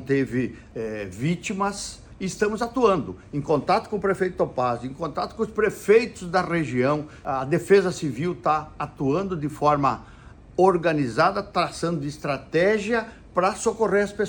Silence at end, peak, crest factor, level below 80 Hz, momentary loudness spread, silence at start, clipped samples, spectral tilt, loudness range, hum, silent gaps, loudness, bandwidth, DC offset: 0 s; -6 dBFS; 18 dB; -50 dBFS; 11 LU; 0 s; under 0.1%; -6 dB/octave; 2 LU; none; none; -24 LUFS; 19.5 kHz; under 0.1%